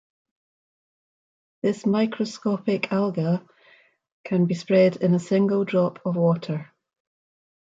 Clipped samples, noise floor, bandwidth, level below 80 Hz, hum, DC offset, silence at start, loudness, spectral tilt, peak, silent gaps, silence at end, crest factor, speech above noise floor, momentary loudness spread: under 0.1%; -58 dBFS; 7.8 kHz; -70 dBFS; none; under 0.1%; 1.65 s; -23 LUFS; -7.5 dB/octave; -8 dBFS; 4.12-4.24 s; 1.1 s; 18 dB; 35 dB; 8 LU